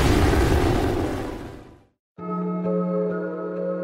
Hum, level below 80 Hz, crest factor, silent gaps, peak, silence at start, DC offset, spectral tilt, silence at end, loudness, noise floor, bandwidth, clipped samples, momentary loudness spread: none; -30 dBFS; 16 dB; 1.99-2.15 s; -8 dBFS; 0 s; under 0.1%; -6.5 dB/octave; 0 s; -24 LUFS; -44 dBFS; 16 kHz; under 0.1%; 17 LU